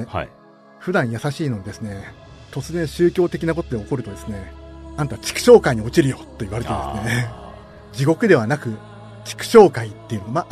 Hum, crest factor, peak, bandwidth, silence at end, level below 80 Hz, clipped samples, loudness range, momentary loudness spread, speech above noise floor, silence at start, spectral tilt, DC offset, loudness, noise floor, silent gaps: none; 20 dB; 0 dBFS; 13.5 kHz; 0.05 s; -42 dBFS; under 0.1%; 6 LU; 23 LU; 20 dB; 0 s; -6 dB/octave; under 0.1%; -19 LUFS; -39 dBFS; none